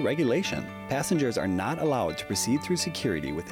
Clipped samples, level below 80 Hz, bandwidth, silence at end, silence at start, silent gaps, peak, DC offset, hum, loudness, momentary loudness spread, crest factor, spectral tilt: under 0.1%; -56 dBFS; 17.5 kHz; 0 s; 0 s; none; -16 dBFS; under 0.1%; none; -28 LUFS; 6 LU; 12 dB; -4.5 dB/octave